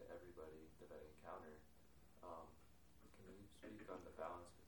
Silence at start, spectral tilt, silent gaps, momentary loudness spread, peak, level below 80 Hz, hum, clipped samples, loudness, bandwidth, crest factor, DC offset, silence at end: 0 s; -5.5 dB/octave; none; 11 LU; -38 dBFS; -74 dBFS; none; under 0.1%; -59 LUFS; over 20 kHz; 22 dB; under 0.1%; 0 s